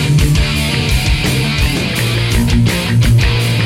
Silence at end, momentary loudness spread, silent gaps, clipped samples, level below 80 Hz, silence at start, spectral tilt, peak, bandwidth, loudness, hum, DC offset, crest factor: 0 s; 3 LU; none; under 0.1%; -20 dBFS; 0 s; -5 dB/octave; -2 dBFS; 16.5 kHz; -13 LUFS; none; under 0.1%; 10 dB